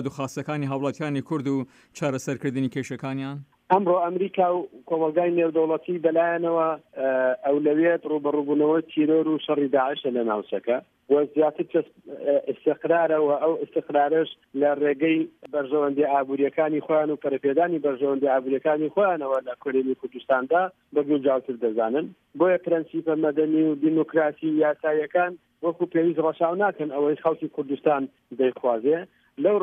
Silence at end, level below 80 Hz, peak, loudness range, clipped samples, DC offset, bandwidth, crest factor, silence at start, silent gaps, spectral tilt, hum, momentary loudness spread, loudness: 0 s; -76 dBFS; -6 dBFS; 2 LU; under 0.1%; under 0.1%; 9 kHz; 16 dB; 0 s; none; -7 dB/octave; none; 8 LU; -24 LUFS